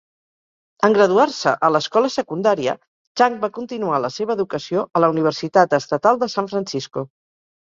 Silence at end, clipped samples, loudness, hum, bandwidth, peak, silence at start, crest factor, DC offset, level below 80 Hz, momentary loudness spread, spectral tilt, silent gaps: 0.65 s; under 0.1%; -19 LUFS; none; 7.6 kHz; -2 dBFS; 0.8 s; 18 dB; under 0.1%; -64 dBFS; 10 LU; -5 dB/octave; 2.88-3.15 s